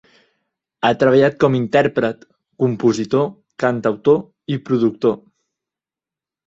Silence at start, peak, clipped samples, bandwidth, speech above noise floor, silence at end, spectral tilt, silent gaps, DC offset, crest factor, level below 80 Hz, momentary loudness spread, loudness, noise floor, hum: 0.8 s; -2 dBFS; under 0.1%; 7.8 kHz; 73 dB; 1.3 s; -7 dB/octave; none; under 0.1%; 18 dB; -58 dBFS; 10 LU; -18 LUFS; -89 dBFS; none